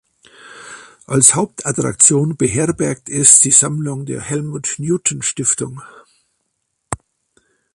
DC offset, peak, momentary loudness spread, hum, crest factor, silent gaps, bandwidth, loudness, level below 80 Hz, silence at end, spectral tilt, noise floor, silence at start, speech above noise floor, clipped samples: under 0.1%; 0 dBFS; 20 LU; none; 18 dB; none; 16 kHz; -13 LUFS; -50 dBFS; 0.8 s; -3.5 dB/octave; -71 dBFS; 0.45 s; 55 dB; under 0.1%